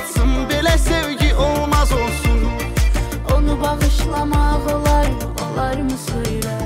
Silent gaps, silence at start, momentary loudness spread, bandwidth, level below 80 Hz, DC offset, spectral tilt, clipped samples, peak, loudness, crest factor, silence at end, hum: none; 0 s; 6 LU; 16.5 kHz; -20 dBFS; under 0.1%; -5 dB/octave; under 0.1%; -6 dBFS; -18 LUFS; 10 dB; 0 s; none